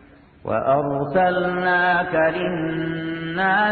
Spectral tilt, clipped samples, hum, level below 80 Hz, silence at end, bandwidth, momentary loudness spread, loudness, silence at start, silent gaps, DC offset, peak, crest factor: -9 dB/octave; under 0.1%; none; -52 dBFS; 0 s; 4.7 kHz; 8 LU; -21 LUFS; 0.45 s; none; under 0.1%; -8 dBFS; 14 dB